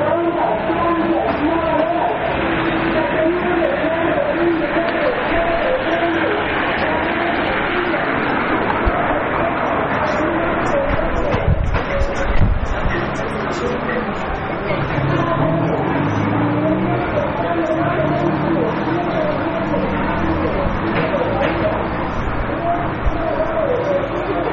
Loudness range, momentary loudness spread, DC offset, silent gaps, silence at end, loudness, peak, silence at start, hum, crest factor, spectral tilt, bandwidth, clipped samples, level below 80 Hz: 2 LU; 3 LU; under 0.1%; none; 0 s; -18 LUFS; -6 dBFS; 0 s; none; 12 dB; -5 dB/octave; 7.2 kHz; under 0.1%; -28 dBFS